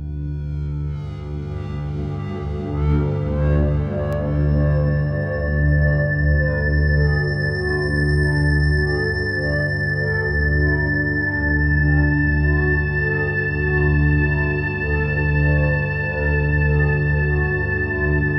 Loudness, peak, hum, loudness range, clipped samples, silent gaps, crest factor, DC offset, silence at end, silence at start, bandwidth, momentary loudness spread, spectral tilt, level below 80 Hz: -20 LUFS; -6 dBFS; 50 Hz at -40 dBFS; 3 LU; under 0.1%; none; 12 dB; under 0.1%; 0 s; 0 s; 9.2 kHz; 9 LU; -9 dB/octave; -24 dBFS